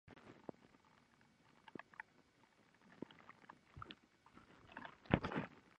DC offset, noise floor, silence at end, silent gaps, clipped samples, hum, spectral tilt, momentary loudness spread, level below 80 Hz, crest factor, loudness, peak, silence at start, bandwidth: under 0.1%; -73 dBFS; 0.2 s; none; under 0.1%; none; -7.5 dB/octave; 26 LU; -66 dBFS; 36 dB; -48 LUFS; -14 dBFS; 0.05 s; 10 kHz